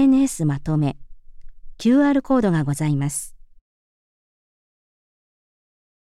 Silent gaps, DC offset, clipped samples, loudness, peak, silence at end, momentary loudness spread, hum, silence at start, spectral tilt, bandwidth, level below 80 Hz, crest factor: none; under 0.1%; under 0.1%; -20 LUFS; -6 dBFS; 2.8 s; 10 LU; none; 0 s; -6.5 dB/octave; 13.5 kHz; -44 dBFS; 16 dB